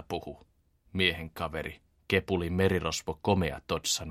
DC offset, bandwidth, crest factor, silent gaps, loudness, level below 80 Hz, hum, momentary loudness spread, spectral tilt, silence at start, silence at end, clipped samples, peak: under 0.1%; 16 kHz; 22 dB; none; -30 LUFS; -50 dBFS; none; 11 LU; -4 dB/octave; 0 s; 0 s; under 0.1%; -8 dBFS